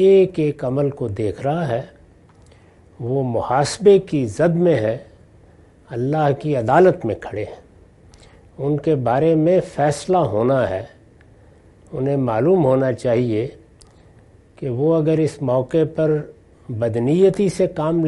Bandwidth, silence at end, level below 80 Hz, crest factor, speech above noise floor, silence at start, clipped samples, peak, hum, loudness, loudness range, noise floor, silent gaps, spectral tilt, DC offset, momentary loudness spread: 11.5 kHz; 0 s; -52 dBFS; 18 dB; 31 dB; 0 s; under 0.1%; 0 dBFS; none; -19 LUFS; 2 LU; -49 dBFS; none; -7.5 dB/octave; under 0.1%; 13 LU